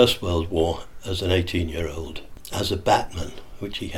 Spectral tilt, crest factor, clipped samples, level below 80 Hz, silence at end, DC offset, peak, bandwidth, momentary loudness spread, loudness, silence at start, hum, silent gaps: -5 dB/octave; 22 dB; under 0.1%; -38 dBFS; 0 s; under 0.1%; -2 dBFS; 17.5 kHz; 14 LU; -25 LUFS; 0 s; none; none